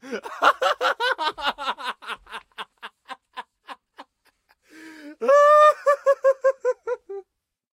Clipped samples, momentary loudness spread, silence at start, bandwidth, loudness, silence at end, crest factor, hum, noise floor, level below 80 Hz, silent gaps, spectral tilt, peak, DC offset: under 0.1%; 25 LU; 0.05 s; 15 kHz; -20 LUFS; 0.5 s; 20 dB; none; -71 dBFS; -68 dBFS; none; -1 dB/octave; -4 dBFS; under 0.1%